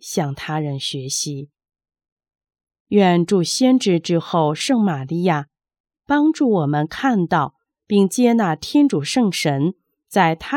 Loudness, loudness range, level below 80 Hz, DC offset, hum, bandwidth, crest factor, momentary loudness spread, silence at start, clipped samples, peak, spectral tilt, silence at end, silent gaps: -19 LUFS; 2 LU; -58 dBFS; under 0.1%; none; 17.5 kHz; 16 dB; 8 LU; 0.05 s; under 0.1%; -2 dBFS; -5.5 dB/octave; 0 s; 2.12-2.17 s, 2.80-2.86 s, 5.80-5.84 s